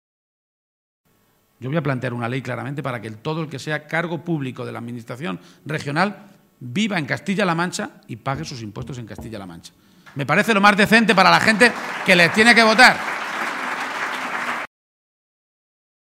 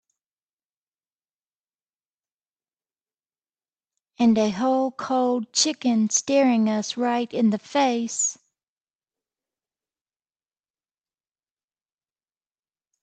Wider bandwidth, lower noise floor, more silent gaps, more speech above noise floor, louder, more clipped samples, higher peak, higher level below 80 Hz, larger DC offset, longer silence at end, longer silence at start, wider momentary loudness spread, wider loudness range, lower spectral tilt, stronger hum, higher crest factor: first, 16 kHz vs 9.2 kHz; second, -62 dBFS vs under -90 dBFS; neither; second, 42 dB vs over 68 dB; first, -18 LUFS vs -22 LUFS; neither; first, 0 dBFS vs -8 dBFS; first, -56 dBFS vs -74 dBFS; neither; second, 1.4 s vs 4.7 s; second, 1.6 s vs 4.2 s; first, 20 LU vs 5 LU; first, 13 LU vs 7 LU; about the same, -4.5 dB/octave vs -3.5 dB/octave; neither; about the same, 20 dB vs 20 dB